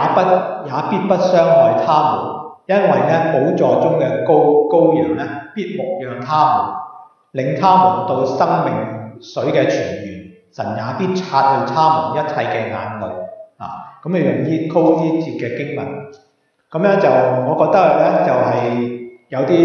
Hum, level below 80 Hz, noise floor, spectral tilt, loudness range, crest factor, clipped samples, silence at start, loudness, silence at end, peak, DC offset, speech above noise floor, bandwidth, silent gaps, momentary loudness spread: none; -64 dBFS; -37 dBFS; -7.5 dB/octave; 5 LU; 14 dB; under 0.1%; 0 s; -16 LUFS; 0 s; 0 dBFS; under 0.1%; 22 dB; 7 kHz; none; 15 LU